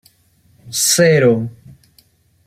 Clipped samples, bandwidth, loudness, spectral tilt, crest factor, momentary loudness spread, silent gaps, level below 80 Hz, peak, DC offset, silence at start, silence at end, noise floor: under 0.1%; 16 kHz; -13 LUFS; -3.5 dB/octave; 16 dB; 13 LU; none; -58 dBFS; -2 dBFS; under 0.1%; 0.65 s; 0.95 s; -55 dBFS